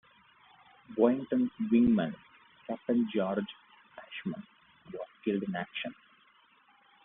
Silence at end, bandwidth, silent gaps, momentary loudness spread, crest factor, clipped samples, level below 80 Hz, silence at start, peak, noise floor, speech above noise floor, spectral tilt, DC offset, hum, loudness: 1.1 s; 3.8 kHz; none; 19 LU; 22 dB; under 0.1%; -64 dBFS; 0.9 s; -12 dBFS; -64 dBFS; 35 dB; -5.5 dB/octave; under 0.1%; none; -31 LUFS